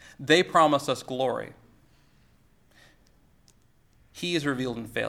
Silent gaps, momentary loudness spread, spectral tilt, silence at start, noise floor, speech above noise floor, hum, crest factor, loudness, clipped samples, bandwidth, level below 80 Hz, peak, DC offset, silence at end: none; 13 LU; -4.5 dB/octave; 0.05 s; -61 dBFS; 36 dB; none; 22 dB; -25 LUFS; under 0.1%; 16.5 kHz; -62 dBFS; -6 dBFS; under 0.1%; 0 s